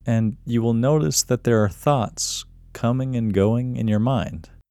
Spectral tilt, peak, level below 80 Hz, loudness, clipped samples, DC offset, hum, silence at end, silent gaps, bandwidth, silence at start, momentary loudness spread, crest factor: -5.5 dB/octave; -4 dBFS; -46 dBFS; -21 LUFS; under 0.1%; under 0.1%; none; 0.25 s; none; 15.5 kHz; 0.05 s; 7 LU; 16 dB